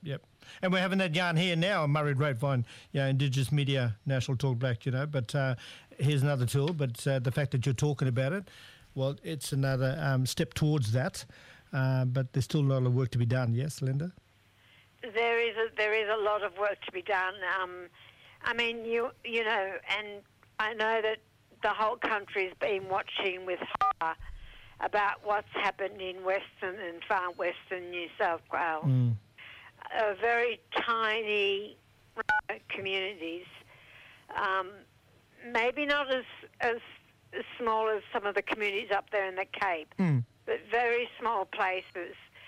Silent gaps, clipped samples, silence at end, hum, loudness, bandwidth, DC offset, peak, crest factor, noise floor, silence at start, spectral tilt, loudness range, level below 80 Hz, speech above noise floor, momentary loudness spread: none; under 0.1%; 0 s; none; -31 LUFS; 14.5 kHz; under 0.1%; -18 dBFS; 12 dB; -63 dBFS; 0 s; -6 dB/octave; 3 LU; -62 dBFS; 33 dB; 12 LU